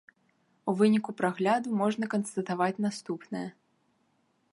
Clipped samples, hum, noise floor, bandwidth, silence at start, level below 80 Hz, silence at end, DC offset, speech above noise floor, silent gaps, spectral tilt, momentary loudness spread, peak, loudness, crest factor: under 0.1%; none; -72 dBFS; 11.5 kHz; 0.65 s; -78 dBFS; 1 s; under 0.1%; 43 dB; none; -6 dB/octave; 13 LU; -12 dBFS; -29 LUFS; 18 dB